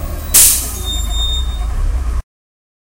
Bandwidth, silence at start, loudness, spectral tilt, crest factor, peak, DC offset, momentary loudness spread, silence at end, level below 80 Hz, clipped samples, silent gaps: over 20 kHz; 0 s; -13 LUFS; -1.5 dB/octave; 16 dB; 0 dBFS; under 0.1%; 15 LU; 0.75 s; -20 dBFS; 0.3%; none